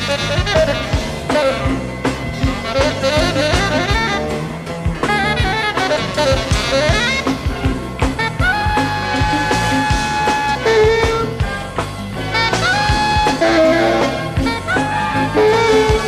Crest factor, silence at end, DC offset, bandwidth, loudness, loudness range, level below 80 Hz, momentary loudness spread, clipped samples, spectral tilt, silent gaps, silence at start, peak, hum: 14 dB; 0 s; under 0.1%; 15.5 kHz; -16 LUFS; 2 LU; -26 dBFS; 8 LU; under 0.1%; -4.5 dB/octave; none; 0 s; -2 dBFS; none